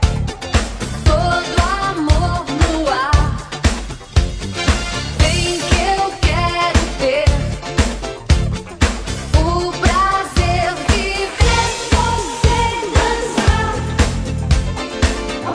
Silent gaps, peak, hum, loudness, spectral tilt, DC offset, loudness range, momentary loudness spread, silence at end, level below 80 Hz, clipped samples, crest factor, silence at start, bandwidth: none; 0 dBFS; none; -17 LUFS; -4.5 dB/octave; under 0.1%; 2 LU; 5 LU; 0 s; -20 dBFS; under 0.1%; 16 dB; 0 s; 11 kHz